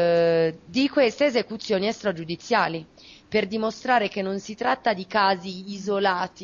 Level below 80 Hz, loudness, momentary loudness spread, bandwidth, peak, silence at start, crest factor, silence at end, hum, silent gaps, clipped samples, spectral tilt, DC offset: -62 dBFS; -24 LUFS; 8 LU; 7.4 kHz; -8 dBFS; 0 s; 16 dB; 0 s; none; none; under 0.1%; -5 dB/octave; under 0.1%